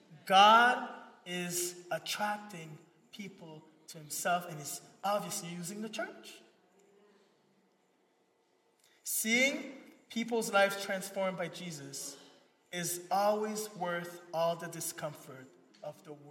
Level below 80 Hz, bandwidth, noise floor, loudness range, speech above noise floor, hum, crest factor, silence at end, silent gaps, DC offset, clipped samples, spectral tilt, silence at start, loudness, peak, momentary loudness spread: under -90 dBFS; 16.5 kHz; -73 dBFS; 8 LU; 39 dB; none; 24 dB; 0 s; none; under 0.1%; under 0.1%; -2.5 dB/octave; 0.1 s; -32 LUFS; -10 dBFS; 21 LU